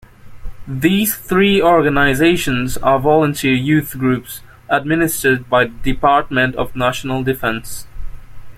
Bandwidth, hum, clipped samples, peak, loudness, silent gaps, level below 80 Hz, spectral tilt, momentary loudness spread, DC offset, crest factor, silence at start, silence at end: 16.5 kHz; none; under 0.1%; -2 dBFS; -15 LUFS; none; -34 dBFS; -5 dB/octave; 8 LU; under 0.1%; 14 dB; 0.25 s; 0 s